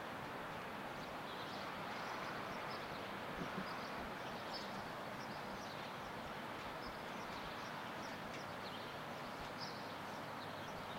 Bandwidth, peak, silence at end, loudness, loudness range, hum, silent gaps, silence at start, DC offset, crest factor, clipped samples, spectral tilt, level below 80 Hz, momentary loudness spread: 16 kHz; -32 dBFS; 0 s; -47 LUFS; 2 LU; none; none; 0 s; under 0.1%; 14 dB; under 0.1%; -4.5 dB/octave; -68 dBFS; 2 LU